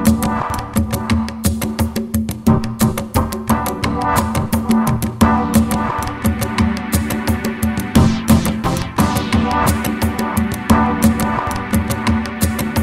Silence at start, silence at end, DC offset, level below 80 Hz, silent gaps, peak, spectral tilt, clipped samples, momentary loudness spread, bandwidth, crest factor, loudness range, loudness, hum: 0 s; 0 s; 0.2%; -28 dBFS; none; 0 dBFS; -5.5 dB/octave; under 0.1%; 5 LU; 16.5 kHz; 16 dB; 2 LU; -17 LUFS; none